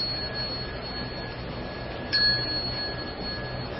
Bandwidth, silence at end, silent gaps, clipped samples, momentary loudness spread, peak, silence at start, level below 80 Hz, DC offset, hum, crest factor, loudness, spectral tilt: 6 kHz; 0 s; none; under 0.1%; 13 LU; -12 dBFS; 0 s; -44 dBFS; under 0.1%; none; 18 dB; -28 LUFS; -7.5 dB/octave